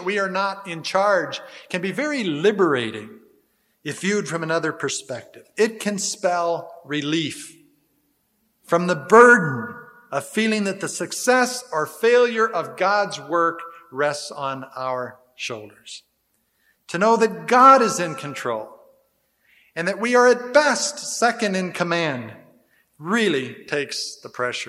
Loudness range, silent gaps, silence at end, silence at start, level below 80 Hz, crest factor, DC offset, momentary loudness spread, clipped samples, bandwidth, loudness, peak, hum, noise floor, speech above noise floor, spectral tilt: 7 LU; none; 0 s; 0 s; -74 dBFS; 20 dB; under 0.1%; 18 LU; under 0.1%; 15 kHz; -20 LUFS; 0 dBFS; none; -69 dBFS; 48 dB; -3.5 dB/octave